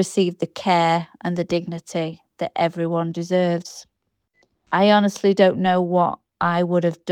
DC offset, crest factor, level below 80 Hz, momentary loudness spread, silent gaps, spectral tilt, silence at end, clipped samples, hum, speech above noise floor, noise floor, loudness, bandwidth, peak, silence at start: under 0.1%; 18 dB; -64 dBFS; 11 LU; none; -6 dB/octave; 0 s; under 0.1%; none; 49 dB; -69 dBFS; -21 LUFS; 13.5 kHz; -2 dBFS; 0 s